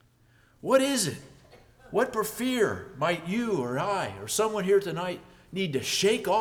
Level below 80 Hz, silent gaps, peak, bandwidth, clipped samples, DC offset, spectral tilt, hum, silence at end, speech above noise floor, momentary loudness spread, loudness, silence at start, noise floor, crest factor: -62 dBFS; none; -8 dBFS; over 20 kHz; under 0.1%; under 0.1%; -4 dB/octave; none; 0 s; 34 dB; 9 LU; -27 LUFS; 0.65 s; -61 dBFS; 20 dB